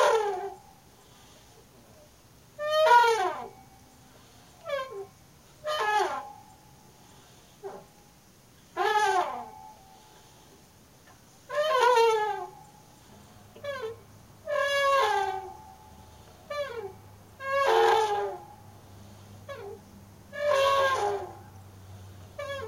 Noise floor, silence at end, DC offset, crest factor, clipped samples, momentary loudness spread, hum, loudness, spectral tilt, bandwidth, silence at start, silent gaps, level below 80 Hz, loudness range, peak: -57 dBFS; 0 s; under 0.1%; 22 dB; under 0.1%; 26 LU; none; -27 LUFS; -2.5 dB/octave; 16 kHz; 0 s; none; -64 dBFS; 6 LU; -8 dBFS